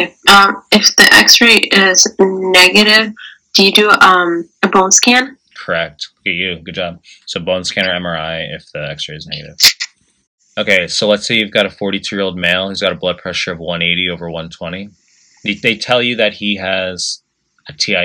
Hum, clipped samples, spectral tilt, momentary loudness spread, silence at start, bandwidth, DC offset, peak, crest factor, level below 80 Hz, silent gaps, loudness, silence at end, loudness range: none; 0.6%; -2 dB/octave; 18 LU; 0 s; over 20 kHz; under 0.1%; 0 dBFS; 14 dB; -50 dBFS; 10.27-10.38 s; -10 LUFS; 0 s; 11 LU